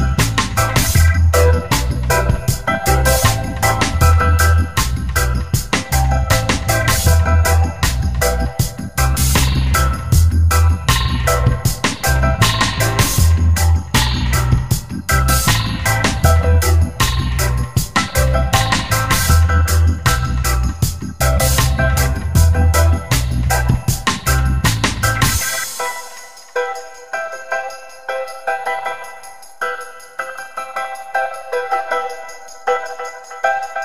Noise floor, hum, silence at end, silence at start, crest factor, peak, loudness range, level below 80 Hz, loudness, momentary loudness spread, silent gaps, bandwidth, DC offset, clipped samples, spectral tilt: -37 dBFS; none; 0 s; 0 s; 16 dB; 0 dBFS; 9 LU; -20 dBFS; -16 LUFS; 11 LU; none; 16.5 kHz; 2%; under 0.1%; -4 dB/octave